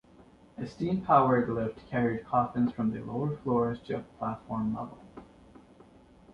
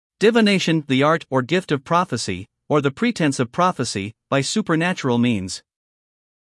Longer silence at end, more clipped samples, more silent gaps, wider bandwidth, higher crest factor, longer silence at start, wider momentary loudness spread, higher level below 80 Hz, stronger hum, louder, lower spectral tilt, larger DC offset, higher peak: first, 1.1 s vs 0.9 s; neither; neither; second, 6.8 kHz vs 12 kHz; first, 22 dB vs 16 dB; first, 0.6 s vs 0.2 s; first, 18 LU vs 9 LU; first, -58 dBFS vs -64 dBFS; neither; second, -30 LUFS vs -20 LUFS; first, -9.5 dB/octave vs -5 dB/octave; neither; second, -10 dBFS vs -4 dBFS